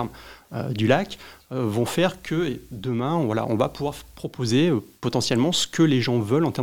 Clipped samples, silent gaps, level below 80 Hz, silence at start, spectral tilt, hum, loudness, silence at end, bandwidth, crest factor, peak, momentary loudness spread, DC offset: under 0.1%; none; -54 dBFS; 0 s; -5.5 dB/octave; none; -24 LUFS; 0 s; 18 kHz; 20 dB; -2 dBFS; 13 LU; 0.2%